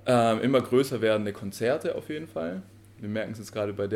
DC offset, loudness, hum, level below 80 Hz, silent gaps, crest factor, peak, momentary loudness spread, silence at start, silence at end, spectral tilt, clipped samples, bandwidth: under 0.1%; -28 LUFS; none; -66 dBFS; none; 16 dB; -10 dBFS; 12 LU; 0.05 s; 0 s; -6 dB/octave; under 0.1%; 16.5 kHz